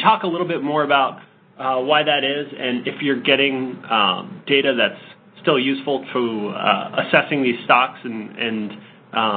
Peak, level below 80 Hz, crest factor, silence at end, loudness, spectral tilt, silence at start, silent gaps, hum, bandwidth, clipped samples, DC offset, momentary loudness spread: 0 dBFS; -68 dBFS; 20 dB; 0 s; -19 LUFS; -8.5 dB/octave; 0 s; none; none; 4.6 kHz; under 0.1%; under 0.1%; 10 LU